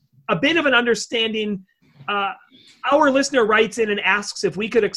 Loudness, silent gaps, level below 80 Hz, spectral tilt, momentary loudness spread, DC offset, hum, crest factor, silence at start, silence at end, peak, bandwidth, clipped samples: -19 LUFS; none; -58 dBFS; -3.5 dB/octave; 11 LU; under 0.1%; none; 16 dB; 0.3 s; 0 s; -4 dBFS; 12 kHz; under 0.1%